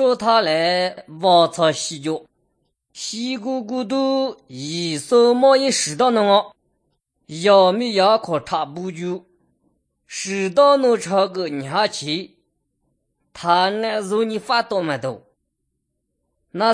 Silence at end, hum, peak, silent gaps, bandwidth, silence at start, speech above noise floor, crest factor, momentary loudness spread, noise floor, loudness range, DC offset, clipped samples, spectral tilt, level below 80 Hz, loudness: 0 s; none; -2 dBFS; none; 10.5 kHz; 0 s; 56 dB; 18 dB; 14 LU; -75 dBFS; 5 LU; under 0.1%; under 0.1%; -4 dB/octave; -68 dBFS; -19 LUFS